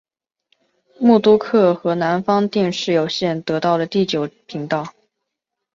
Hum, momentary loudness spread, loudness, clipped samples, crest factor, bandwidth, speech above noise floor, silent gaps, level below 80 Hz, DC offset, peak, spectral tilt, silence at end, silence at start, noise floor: none; 10 LU; -18 LUFS; under 0.1%; 16 dB; 7.6 kHz; 63 dB; none; -62 dBFS; under 0.1%; -2 dBFS; -6 dB/octave; 0.85 s; 1 s; -80 dBFS